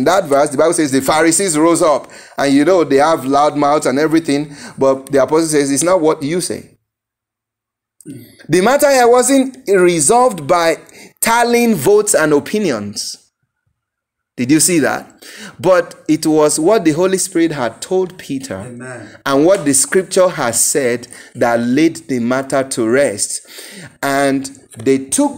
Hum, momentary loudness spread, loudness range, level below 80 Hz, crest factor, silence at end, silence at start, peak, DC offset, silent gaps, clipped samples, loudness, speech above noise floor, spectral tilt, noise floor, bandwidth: none; 13 LU; 4 LU; -52 dBFS; 14 dB; 0 s; 0 s; 0 dBFS; under 0.1%; none; under 0.1%; -13 LUFS; 68 dB; -4 dB/octave; -82 dBFS; 16.5 kHz